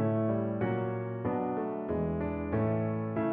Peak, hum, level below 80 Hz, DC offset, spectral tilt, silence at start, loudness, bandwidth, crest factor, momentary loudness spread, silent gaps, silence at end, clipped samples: -18 dBFS; none; -52 dBFS; under 0.1%; -9 dB/octave; 0 s; -32 LUFS; 3.6 kHz; 12 dB; 4 LU; none; 0 s; under 0.1%